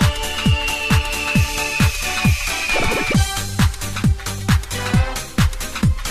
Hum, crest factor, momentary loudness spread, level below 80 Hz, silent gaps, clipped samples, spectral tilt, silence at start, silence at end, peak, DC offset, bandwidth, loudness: none; 14 dB; 3 LU; -26 dBFS; none; under 0.1%; -4.5 dB/octave; 0 s; 0 s; -4 dBFS; 0.2%; 14.5 kHz; -19 LUFS